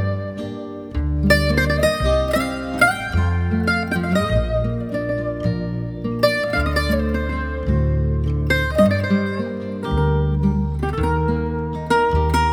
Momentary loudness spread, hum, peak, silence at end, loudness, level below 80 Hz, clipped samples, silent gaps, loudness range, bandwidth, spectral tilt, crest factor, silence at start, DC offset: 9 LU; none; -2 dBFS; 0 s; -20 LUFS; -26 dBFS; under 0.1%; none; 3 LU; 18 kHz; -6.5 dB/octave; 18 dB; 0 s; under 0.1%